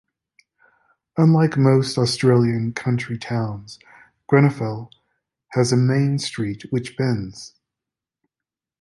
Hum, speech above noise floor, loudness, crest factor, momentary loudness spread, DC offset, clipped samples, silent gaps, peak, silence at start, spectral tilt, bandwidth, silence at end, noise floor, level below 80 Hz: none; 69 dB; -20 LUFS; 18 dB; 14 LU; under 0.1%; under 0.1%; none; -2 dBFS; 1.15 s; -6.5 dB/octave; 11.5 kHz; 1.35 s; -88 dBFS; -56 dBFS